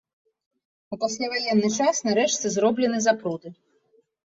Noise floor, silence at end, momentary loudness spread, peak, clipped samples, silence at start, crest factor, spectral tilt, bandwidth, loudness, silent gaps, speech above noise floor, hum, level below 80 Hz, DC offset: -65 dBFS; 0.7 s; 9 LU; -8 dBFS; under 0.1%; 0.9 s; 18 dB; -3.5 dB/octave; 7.8 kHz; -23 LUFS; none; 41 dB; none; -68 dBFS; under 0.1%